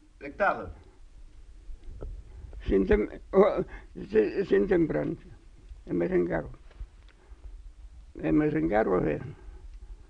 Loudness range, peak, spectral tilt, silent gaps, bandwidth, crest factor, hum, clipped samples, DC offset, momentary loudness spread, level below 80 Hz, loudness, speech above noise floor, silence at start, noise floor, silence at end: 5 LU; -8 dBFS; -9 dB/octave; none; 7.4 kHz; 20 dB; none; under 0.1%; under 0.1%; 24 LU; -44 dBFS; -27 LUFS; 25 dB; 0.2 s; -51 dBFS; 0.15 s